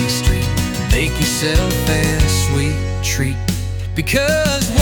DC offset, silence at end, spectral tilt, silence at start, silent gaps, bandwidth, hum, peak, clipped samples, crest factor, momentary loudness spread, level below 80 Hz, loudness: under 0.1%; 0 s; -4.5 dB/octave; 0 s; none; 19 kHz; none; -2 dBFS; under 0.1%; 14 dB; 5 LU; -22 dBFS; -17 LUFS